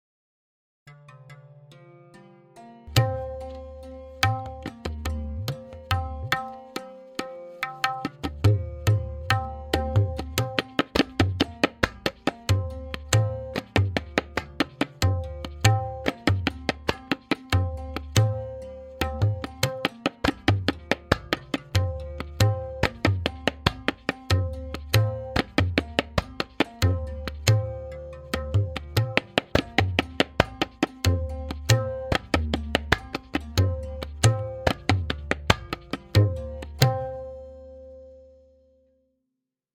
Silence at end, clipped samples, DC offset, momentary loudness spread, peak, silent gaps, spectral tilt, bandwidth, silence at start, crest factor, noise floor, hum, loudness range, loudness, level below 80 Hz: 1.5 s; under 0.1%; under 0.1%; 12 LU; 0 dBFS; none; -5 dB/octave; 17 kHz; 0.85 s; 26 dB; -83 dBFS; none; 5 LU; -26 LUFS; -40 dBFS